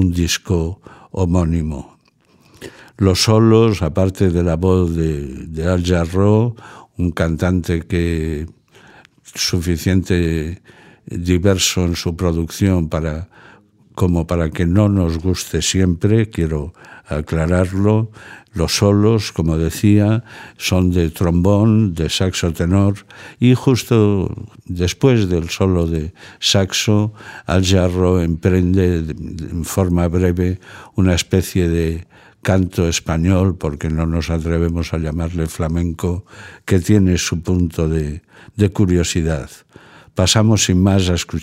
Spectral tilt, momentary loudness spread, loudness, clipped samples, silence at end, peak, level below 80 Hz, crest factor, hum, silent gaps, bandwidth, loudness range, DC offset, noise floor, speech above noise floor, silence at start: -5.5 dB/octave; 13 LU; -17 LUFS; under 0.1%; 0 s; 0 dBFS; -32 dBFS; 16 dB; none; none; 16 kHz; 3 LU; under 0.1%; -55 dBFS; 38 dB; 0 s